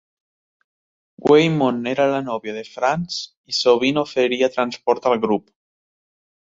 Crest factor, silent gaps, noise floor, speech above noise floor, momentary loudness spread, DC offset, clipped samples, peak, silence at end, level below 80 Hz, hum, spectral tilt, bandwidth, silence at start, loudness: 18 dB; 3.37-3.44 s; under -90 dBFS; over 71 dB; 11 LU; under 0.1%; under 0.1%; -2 dBFS; 1.1 s; -62 dBFS; none; -5 dB/octave; 7.8 kHz; 1.2 s; -19 LUFS